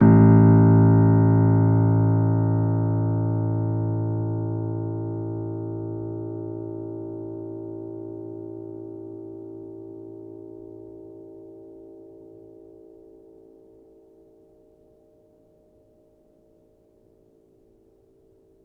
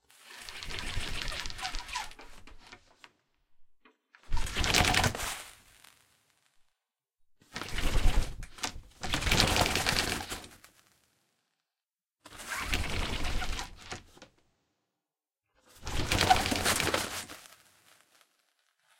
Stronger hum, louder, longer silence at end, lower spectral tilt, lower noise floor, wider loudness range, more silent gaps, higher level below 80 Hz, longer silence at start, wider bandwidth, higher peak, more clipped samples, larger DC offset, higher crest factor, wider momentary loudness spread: neither; first, -21 LUFS vs -31 LUFS; first, 6.65 s vs 1.55 s; first, -14.5 dB/octave vs -2.5 dB/octave; second, -59 dBFS vs under -90 dBFS; first, 25 LU vs 9 LU; neither; second, -52 dBFS vs -38 dBFS; second, 0 s vs 0.25 s; second, 2.2 kHz vs 17 kHz; about the same, -4 dBFS vs -2 dBFS; neither; neither; second, 18 dB vs 30 dB; first, 26 LU vs 20 LU